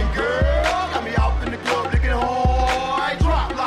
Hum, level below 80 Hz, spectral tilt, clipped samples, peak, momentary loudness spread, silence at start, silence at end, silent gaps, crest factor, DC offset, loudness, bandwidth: none; -24 dBFS; -5.5 dB/octave; under 0.1%; -6 dBFS; 4 LU; 0 s; 0 s; none; 14 dB; under 0.1%; -21 LUFS; 11 kHz